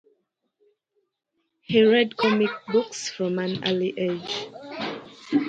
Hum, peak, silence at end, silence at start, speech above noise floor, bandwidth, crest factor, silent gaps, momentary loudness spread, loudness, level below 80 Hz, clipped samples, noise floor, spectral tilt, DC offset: none; -6 dBFS; 0 s; 1.7 s; 53 dB; 9 kHz; 20 dB; none; 14 LU; -24 LUFS; -68 dBFS; under 0.1%; -76 dBFS; -5 dB/octave; under 0.1%